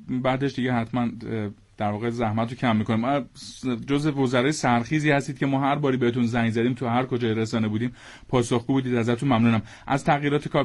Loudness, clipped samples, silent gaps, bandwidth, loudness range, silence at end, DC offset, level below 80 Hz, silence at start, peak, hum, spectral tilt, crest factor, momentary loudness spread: -24 LUFS; under 0.1%; none; 11.5 kHz; 3 LU; 0 s; under 0.1%; -54 dBFS; 0 s; -8 dBFS; none; -6.5 dB/octave; 16 dB; 7 LU